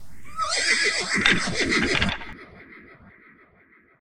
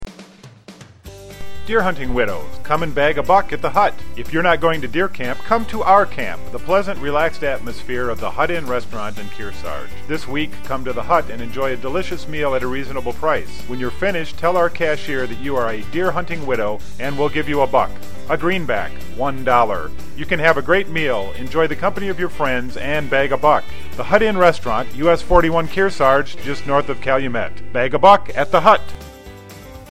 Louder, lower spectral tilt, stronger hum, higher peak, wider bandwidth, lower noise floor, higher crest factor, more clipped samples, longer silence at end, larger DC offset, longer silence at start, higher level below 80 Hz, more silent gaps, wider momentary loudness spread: second, -22 LUFS vs -19 LUFS; second, -2.5 dB/octave vs -5.5 dB/octave; neither; about the same, 0 dBFS vs 0 dBFS; about the same, 16 kHz vs 16 kHz; first, -57 dBFS vs -41 dBFS; first, 26 dB vs 20 dB; neither; about the same, 0 s vs 0 s; second, under 0.1% vs 9%; about the same, 0 s vs 0 s; second, -44 dBFS vs -36 dBFS; neither; first, 18 LU vs 15 LU